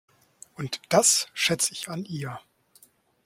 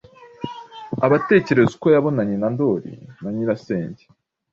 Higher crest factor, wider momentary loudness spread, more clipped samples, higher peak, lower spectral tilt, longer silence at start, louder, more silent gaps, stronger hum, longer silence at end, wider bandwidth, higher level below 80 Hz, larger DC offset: about the same, 22 dB vs 18 dB; about the same, 18 LU vs 18 LU; neither; second, -6 dBFS vs -2 dBFS; second, -2 dB/octave vs -8 dB/octave; first, 0.6 s vs 0.2 s; second, -24 LUFS vs -19 LUFS; neither; neither; first, 0.85 s vs 0.55 s; first, 16.5 kHz vs 7.4 kHz; second, -68 dBFS vs -58 dBFS; neither